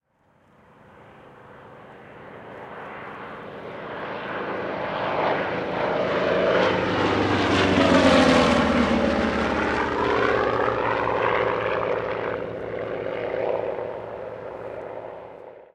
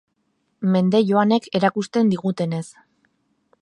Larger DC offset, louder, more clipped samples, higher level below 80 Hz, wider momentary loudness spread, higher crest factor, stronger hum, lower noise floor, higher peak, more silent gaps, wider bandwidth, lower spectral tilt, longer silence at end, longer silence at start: neither; about the same, -22 LUFS vs -20 LUFS; neither; first, -46 dBFS vs -66 dBFS; first, 19 LU vs 9 LU; about the same, 20 dB vs 18 dB; neither; second, -61 dBFS vs -70 dBFS; about the same, -4 dBFS vs -2 dBFS; neither; about the same, 11.5 kHz vs 11 kHz; second, -5.5 dB/octave vs -7 dB/octave; second, 0.1 s vs 0.95 s; first, 0.95 s vs 0.6 s